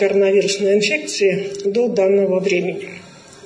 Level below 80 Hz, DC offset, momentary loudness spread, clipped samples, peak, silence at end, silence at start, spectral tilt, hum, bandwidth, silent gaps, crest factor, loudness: -68 dBFS; under 0.1%; 11 LU; under 0.1%; -4 dBFS; 0 s; 0 s; -4.5 dB/octave; none; 10.5 kHz; none; 12 dB; -17 LUFS